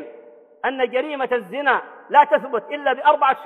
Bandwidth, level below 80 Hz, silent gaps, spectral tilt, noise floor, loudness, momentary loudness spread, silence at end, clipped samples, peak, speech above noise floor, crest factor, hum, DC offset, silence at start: 4.2 kHz; -68 dBFS; none; -5 dB/octave; -46 dBFS; -20 LUFS; 10 LU; 0 s; under 0.1%; -2 dBFS; 26 dB; 18 dB; none; under 0.1%; 0 s